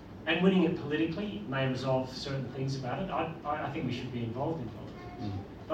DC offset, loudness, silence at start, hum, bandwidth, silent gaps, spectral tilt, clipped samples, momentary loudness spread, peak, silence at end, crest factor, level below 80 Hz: under 0.1%; -33 LUFS; 0 s; none; 8.4 kHz; none; -7 dB/octave; under 0.1%; 12 LU; -12 dBFS; 0 s; 20 dB; -58 dBFS